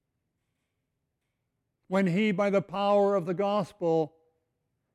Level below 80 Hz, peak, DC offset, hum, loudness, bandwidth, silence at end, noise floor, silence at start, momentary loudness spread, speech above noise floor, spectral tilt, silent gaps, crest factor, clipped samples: -74 dBFS; -14 dBFS; under 0.1%; none; -27 LUFS; 11.5 kHz; 0.85 s; -81 dBFS; 1.9 s; 5 LU; 55 dB; -7.5 dB/octave; none; 16 dB; under 0.1%